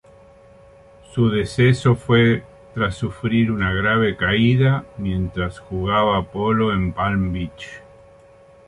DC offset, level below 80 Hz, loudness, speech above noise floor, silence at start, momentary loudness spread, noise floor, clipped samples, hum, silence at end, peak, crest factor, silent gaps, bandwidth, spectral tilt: under 0.1%; -40 dBFS; -19 LUFS; 29 dB; 1.1 s; 11 LU; -48 dBFS; under 0.1%; none; 0.9 s; -4 dBFS; 16 dB; none; 11.5 kHz; -7 dB/octave